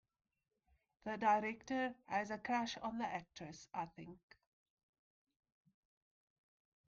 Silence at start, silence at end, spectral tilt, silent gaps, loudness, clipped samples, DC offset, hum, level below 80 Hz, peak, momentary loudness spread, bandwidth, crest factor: 1.05 s; 2.7 s; -3 dB/octave; none; -41 LUFS; under 0.1%; under 0.1%; none; -78 dBFS; -24 dBFS; 17 LU; 7.4 kHz; 22 dB